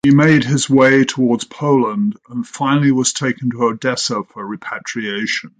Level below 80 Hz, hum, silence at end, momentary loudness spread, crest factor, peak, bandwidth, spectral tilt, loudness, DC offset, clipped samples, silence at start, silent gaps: -56 dBFS; none; 0.1 s; 14 LU; 14 dB; -2 dBFS; 9.6 kHz; -5 dB/octave; -16 LUFS; under 0.1%; under 0.1%; 0.05 s; none